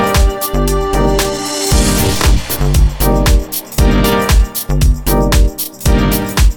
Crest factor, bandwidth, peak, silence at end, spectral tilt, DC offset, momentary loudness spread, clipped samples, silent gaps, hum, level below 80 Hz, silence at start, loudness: 12 dB; 19.5 kHz; 0 dBFS; 0 s; -4.5 dB/octave; under 0.1%; 4 LU; under 0.1%; none; none; -14 dBFS; 0 s; -13 LUFS